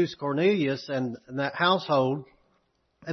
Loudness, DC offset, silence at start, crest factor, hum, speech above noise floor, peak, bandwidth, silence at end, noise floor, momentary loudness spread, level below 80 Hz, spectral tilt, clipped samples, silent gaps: -26 LUFS; under 0.1%; 0 s; 18 dB; none; 45 dB; -10 dBFS; 6.4 kHz; 0 s; -71 dBFS; 9 LU; -70 dBFS; -6.5 dB/octave; under 0.1%; none